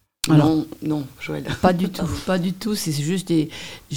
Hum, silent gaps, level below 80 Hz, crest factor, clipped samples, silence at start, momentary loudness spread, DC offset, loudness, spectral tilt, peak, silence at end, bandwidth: none; none; -46 dBFS; 20 dB; under 0.1%; 0.25 s; 12 LU; 0.4%; -22 LUFS; -6 dB/octave; 0 dBFS; 0 s; 18 kHz